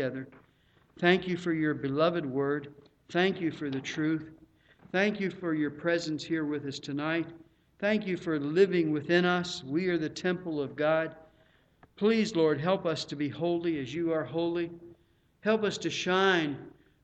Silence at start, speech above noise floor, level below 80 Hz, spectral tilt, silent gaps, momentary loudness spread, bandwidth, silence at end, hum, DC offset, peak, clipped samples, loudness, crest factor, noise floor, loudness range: 0 s; 37 dB; -68 dBFS; -5.5 dB/octave; none; 9 LU; 8.6 kHz; 0.35 s; none; under 0.1%; -10 dBFS; under 0.1%; -30 LUFS; 20 dB; -66 dBFS; 3 LU